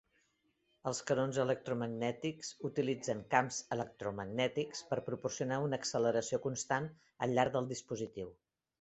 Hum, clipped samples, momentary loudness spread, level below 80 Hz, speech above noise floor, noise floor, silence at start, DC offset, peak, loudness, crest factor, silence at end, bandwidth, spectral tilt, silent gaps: none; under 0.1%; 9 LU; -72 dBFS; 41 dB; -78 dBFS; 0.85 s; under 0.1%; -12 dBFS; -37 LUFS; 24 dB; 0.5 s; 8.2 kHz; -4.5 dB/octave; none